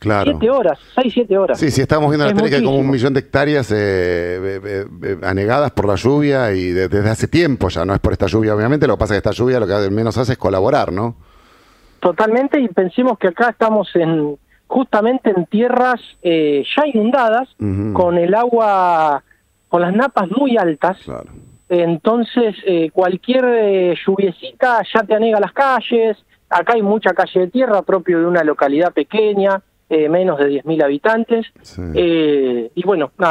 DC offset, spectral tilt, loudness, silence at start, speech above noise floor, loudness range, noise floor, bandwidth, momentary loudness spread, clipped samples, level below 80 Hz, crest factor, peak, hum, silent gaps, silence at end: under 0.1%; -7 dB/octave; -16 LUFS; 0 s; 34 dB; 2 LU; -49 dBFS; 12.5 kHz; 6 LU; under 0.1%; -42 dBFS; 14 dB; 0 dBFS; none; none; 0 s